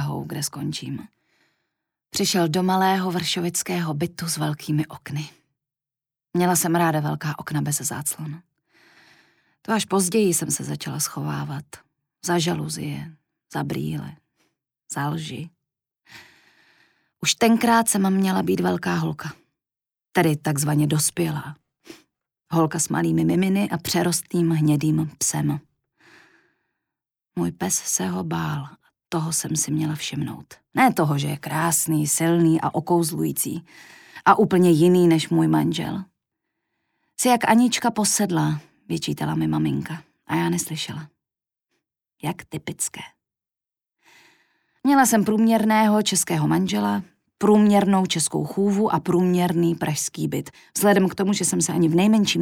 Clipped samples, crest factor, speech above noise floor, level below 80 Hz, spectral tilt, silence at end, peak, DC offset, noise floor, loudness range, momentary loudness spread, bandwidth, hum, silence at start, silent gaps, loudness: under 0.1%; 20 dB; over 69 dB; -60 dBFS; -4.5 dB/octave; 0 s; -2 dBFS; under 0.1%; under -90 dBFS; 9 LU; 14 LU; 18.5 kHz; none; 0 s; none; -22 LUFS